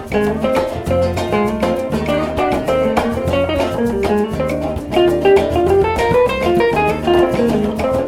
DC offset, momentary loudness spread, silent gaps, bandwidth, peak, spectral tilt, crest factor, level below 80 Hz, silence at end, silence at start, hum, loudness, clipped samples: under 0.1%; 5 LU; none; 16.5 kHz; -2 dBFS; -6.5 dB/octave; 14 dB; -34 dBFS; 0 s; 0 s; none; -16 LUFS; under 0.1%